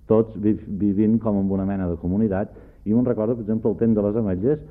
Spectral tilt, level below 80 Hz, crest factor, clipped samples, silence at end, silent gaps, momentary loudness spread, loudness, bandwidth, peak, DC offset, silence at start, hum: -13 dB/octave; -46 dBFS; 16 dB; under 0.1%; 0 s; none; 5 LU; -22 LUFS; 3.3 kHz; -4 dBFS; under 0.1%; 0.1 s; none